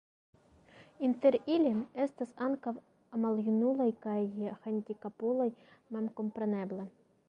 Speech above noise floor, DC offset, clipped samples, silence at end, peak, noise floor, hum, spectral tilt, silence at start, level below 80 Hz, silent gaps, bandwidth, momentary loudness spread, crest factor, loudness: 27 dB; under 0.1%; under 0.1%; 0.4 s; -16 dBFS; -60 dBFS; none; -8.5 dB/octave; 0.75 s; -78 dBFS; none; 5.6 kHz; 13 LU; 18 dB; -34 LUFS